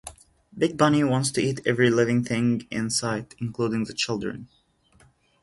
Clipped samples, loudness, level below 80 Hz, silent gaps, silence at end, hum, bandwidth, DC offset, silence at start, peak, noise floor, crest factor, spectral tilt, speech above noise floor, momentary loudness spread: under 0.1%; -24 LUFS; -58 dBFS; none; 1 s; none; 11.5 kHz; under 0.1%; 0.05 s; -4 dBFS; -60 dBFS; 20 dB; -5 dB/octave; 36 dB; 10 LU